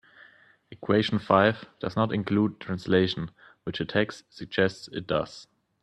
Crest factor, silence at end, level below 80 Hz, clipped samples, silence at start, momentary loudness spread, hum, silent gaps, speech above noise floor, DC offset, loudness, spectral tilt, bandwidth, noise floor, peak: 22 dB; 0.4 s; -60 dBFS; under 0.1%; 0.7 s; 16 LU; none; none; 30 dB; under 0.1%; -27 LUFS; -6.5 dB/octave; 9.2 kHz; -57 dBFS; -6 dBFS